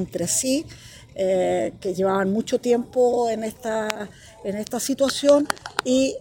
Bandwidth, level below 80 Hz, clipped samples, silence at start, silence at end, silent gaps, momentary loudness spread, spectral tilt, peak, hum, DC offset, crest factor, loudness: 17 kHz; -56 dBFS; under 0.1%; 0 s; 0 s; none; 12 LU; -4 dB/octave; -2 dBFS; none; under 0.1%; 22 dB; -23 LUFS